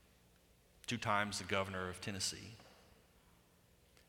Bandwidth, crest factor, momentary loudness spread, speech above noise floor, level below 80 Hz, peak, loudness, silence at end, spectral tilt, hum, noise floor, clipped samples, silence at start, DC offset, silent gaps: 18.5 kHz; 24 dB; 15 LU; 29 dB; -70 dBFS; -20 dBFS; -40 LUFS; 1.3 s; -3 dB/octave; none; -69 dBFS; under 0.1%; 0.85 s; under 0.1%; none